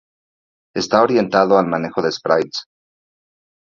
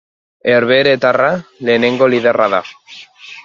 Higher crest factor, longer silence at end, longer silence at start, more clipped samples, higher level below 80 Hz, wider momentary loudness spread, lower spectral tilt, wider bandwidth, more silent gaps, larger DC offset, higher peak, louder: about the same, 18 dB vs 14 dB; first, 1.15 s vs 0.05 s; first, 0.75 s vs 0.45 s; neither; about the same, -60 dBFS vs -60 dBFS; about the same, 12 LU vs 14 LU; about the same, -5 dB/octave vs -6 dB/octave; about the same, 7.6 kHz vs 7.2 kHz; neither; neither; about the same, 0 dBFS vs 0 dBFS; second, -17 LUFS vs -13 LUFS